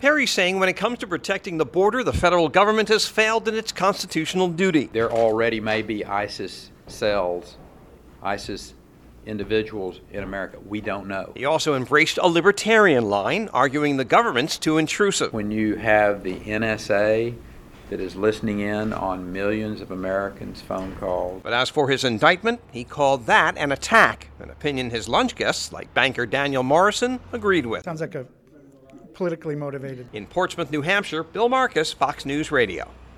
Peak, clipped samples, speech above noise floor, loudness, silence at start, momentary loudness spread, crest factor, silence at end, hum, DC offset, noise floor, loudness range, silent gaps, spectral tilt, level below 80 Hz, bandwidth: 0 dBFS; under 0.1%; 28 dB; -22 LUFS; 0 s; 14 LU; 22 dB; 0.1 s; none; under 0.1%; -50 dBFS; 9 LU; none; -4 dB/octave; -48 dBFS; 16.5 kHz